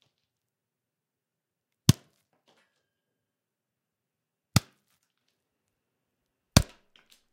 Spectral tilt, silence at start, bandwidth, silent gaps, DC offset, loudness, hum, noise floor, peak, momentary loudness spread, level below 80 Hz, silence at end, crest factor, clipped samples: -4.5 dB/octave; 1.9 s; 16 kHz; none; under 0.1%; -27 LUFS; none; -87 dBFS; 0 dBFS; 8 LU; -48 dBFS; 0.7 s; 34 dB; under 0.1%